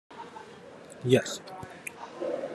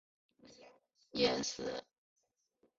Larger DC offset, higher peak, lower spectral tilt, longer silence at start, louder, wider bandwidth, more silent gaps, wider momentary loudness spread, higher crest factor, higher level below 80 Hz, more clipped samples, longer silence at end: neither; first, -8 dBFS vs -18 dBFS; first, -5 dB/octave vs -2 dB/octave; second, 0.1 s vs 0.45 s; first, -31 LUFS vs -37 LUFS; first, 13 kHz vs 7.6 kHz; neither; first, 22 LU vs 12 LU; about the same, 24 dB vs 24 dB; about the same, -72 dBFS vs -72 dBFS; neither; second, 0 s vs 1 s